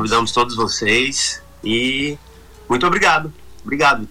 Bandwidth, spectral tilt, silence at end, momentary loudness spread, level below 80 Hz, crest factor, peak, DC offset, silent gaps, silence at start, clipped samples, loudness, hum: 19 kHz; -3 dB/octave; 0 s; 12 LU; -44 dBFS; 16 dB; -4 dBFS; under 0.1%; none; 0 s; under 0.1%; -17 LUFS; none